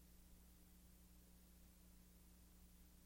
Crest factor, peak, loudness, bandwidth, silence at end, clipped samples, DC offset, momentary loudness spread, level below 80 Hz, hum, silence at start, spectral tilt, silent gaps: 12 dB; -54 dBFS; -68 LUFS; 16.5 kHz; 0 s; under 0.1%; under 0.1%; 0 LU; -68 dBFS; none; 0 s; -4.5 dB/octave; none